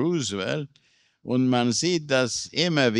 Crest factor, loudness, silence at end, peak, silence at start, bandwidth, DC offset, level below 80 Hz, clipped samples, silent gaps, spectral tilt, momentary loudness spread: 18 dB; -24 LUFS; 0 s; -6 dBFS; 0 s; 11.5 kHz; under 0.1%; -66 dBFS; under 0.1%; none; -4 dB/octave; 9 LU